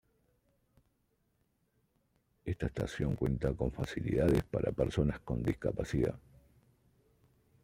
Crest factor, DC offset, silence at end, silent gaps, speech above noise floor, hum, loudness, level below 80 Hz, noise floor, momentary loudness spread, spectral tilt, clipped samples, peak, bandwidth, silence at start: 20 dB; under 0.1%; 1.45 s; none; 44 dB; none; -34 LUFS; -48 dBFS; -77 dBFS; 8 LU; -7.5 dB/octave; under 0.1%; -16 dBFS; 16 kHz; 2.45 s